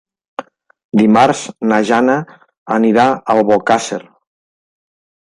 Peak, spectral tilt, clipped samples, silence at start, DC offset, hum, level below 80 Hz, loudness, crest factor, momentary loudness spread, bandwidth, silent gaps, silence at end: 0 dBFS; -5.5 dB/octave; under 0.1%; 0.4 s; under 0.1%; none; -56 dBFS; -13 LUFS; 14 dB; 20 LU; 11 kHz; 0.84-0.89 s, 2.58-2.66 s; 1.35 s